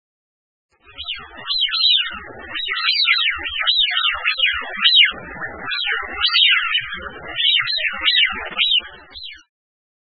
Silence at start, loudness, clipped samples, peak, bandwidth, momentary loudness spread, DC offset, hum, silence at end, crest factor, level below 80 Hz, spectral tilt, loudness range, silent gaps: 0.9 s; -16 LUFS; under 0.1%; -2 dBFS; 6.2 kHz; 17 LU; 0.3%; none; 0.65 s; 18 dB; -50 dBFS; -3 dB/octave; 3 LU; none